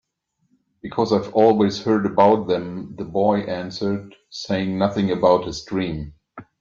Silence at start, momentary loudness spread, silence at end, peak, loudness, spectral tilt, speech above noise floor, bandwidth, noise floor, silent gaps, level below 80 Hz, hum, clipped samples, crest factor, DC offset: 0.85 s; 15 LU; 0.2 s; -2 dBFS; -20 LUFS; -6.5 dB/octave; 50 dB; 7.4 kHz; -70 dBFS; none; -52 dBFS; none; under 0.1%; 18 dB; under 0.1%